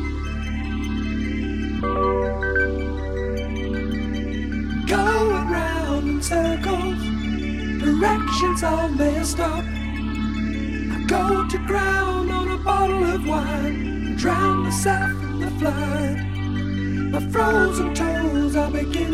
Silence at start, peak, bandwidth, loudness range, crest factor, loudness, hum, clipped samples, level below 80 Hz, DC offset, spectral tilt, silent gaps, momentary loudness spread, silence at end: 0 s; -6 dBFS; 14.5 kHz; 2 LU; 16 dB; -22 LUFS; none; under 0.1%; -30 dBFS; 0.7%; -5.5 dB/octave; none; 7 LU; 0 s